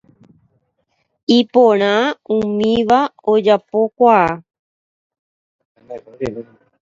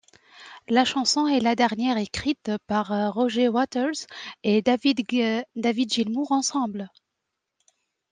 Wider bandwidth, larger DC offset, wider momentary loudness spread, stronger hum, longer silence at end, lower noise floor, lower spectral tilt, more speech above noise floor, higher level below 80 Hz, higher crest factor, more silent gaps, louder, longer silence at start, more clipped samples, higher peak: second, 7.6 kHz vs 9.8 kHz; neither; first, 18 LU vs 8 LU; neither; second, 0.4 s vs 1.25 s; second, -68 dBFS vs -82 dBFS; first, -6 dB/octave vs -4 dB/octave; second, 53 dB vs 58 dB; first, -54 dBFS vs -62 dBFS; about the same, 16 dB vs 18 dB; first, 4.59-5.10 s, 5.19-5.59 s, 5.65-5.75 s vs none; first, -15 LUFS vs -24 LUFS; first, 1.3 s vs 0.35 s; neither; first, 0 dBFS vs -8 dBFS